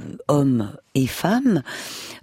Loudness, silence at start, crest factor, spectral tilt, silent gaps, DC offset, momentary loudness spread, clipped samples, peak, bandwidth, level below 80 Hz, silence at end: -22 LUFS; 0 s; 18 dB; -6 dB/octave; none; under 0.1%; 12 LU; under 0.1%; -4 dBFS; 16 kHz; -52 dBFS; 0.05 s